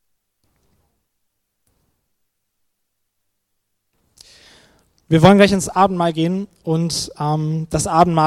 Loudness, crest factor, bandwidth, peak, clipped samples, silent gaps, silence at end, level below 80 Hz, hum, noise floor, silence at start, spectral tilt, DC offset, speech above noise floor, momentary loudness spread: -16 LUFS; 20 dB; 14.5 kHz; 0 dBFS; under 0.1%; none; 0 s; -46 dBFS; none; -72 dBFS; 5.1 s; -5.5 dB/octave; under 0.1%; 57 dB; 11 LU